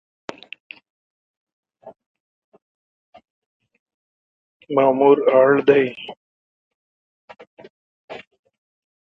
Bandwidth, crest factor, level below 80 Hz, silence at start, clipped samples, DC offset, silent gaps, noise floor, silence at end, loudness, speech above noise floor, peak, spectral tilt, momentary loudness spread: 6.2 kHz; 22 dB; -72 dBFS; 1.85 s; under 0.1%; under 0.1%; 2.06-2.52 s, 2.62-3.13 s, 3.30-3.60 s, 3.79-3.86 s, 3.94-4.60 s, 6.17-7.28 s, 7.47-7.57 s, 7.70-8.08 s; under -90 dBFS; 0.9 s; -16 LUFS; over 75 dB; -2 dBFS; -7.5 dB/octave; 25 LU